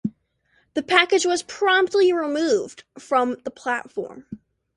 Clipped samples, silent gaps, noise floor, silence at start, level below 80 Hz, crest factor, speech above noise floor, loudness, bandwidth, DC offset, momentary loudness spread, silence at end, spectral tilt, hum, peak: under 0.1%; none; -65 dBFS; 0.05 s; -64 dBFS; 22 dB; 44 dB; -21 LUFS; 11.5 kHz; under 0.1%; 19 LU; 0.4 s; -3 dB/octave; none; 0 dBFS